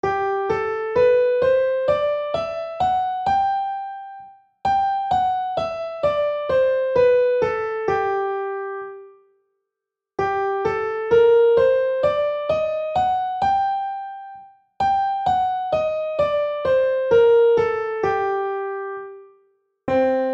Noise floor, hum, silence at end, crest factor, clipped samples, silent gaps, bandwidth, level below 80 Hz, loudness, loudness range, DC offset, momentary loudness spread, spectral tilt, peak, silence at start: -85 dBFS; none; 0 s; 14 dB; under 0.1%; none; 7.6 kHz; -52 dBFS; -20 LUFS; 4 LU; under 0.1%; 12 LU; -6 dB/octave; -8 dBFS; 0.05 s